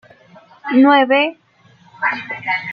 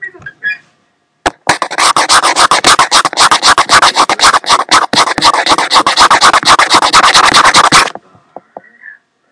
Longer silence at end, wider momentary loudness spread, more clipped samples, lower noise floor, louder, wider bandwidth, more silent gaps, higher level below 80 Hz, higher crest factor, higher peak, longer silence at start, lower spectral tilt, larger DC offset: second, 0 s vs 0.4 s; about the same, 11 LU vs 12 LU; second, under 0.1% vs 2%; second, -50 dBFS vs -57 dBFS; second, -15 LUFS vs -6 LUFS; second, 5.2 kHz vs 11 kHz; neither; second, -70 dBFS vs -40 dBFS; first, 16 dB vs 8 dB; about the same, -2 dBFS vs 0 dBFS; first, 0.65 s vs 0 s; first, -6 dB/octave vs -0.5 dB/octave; neither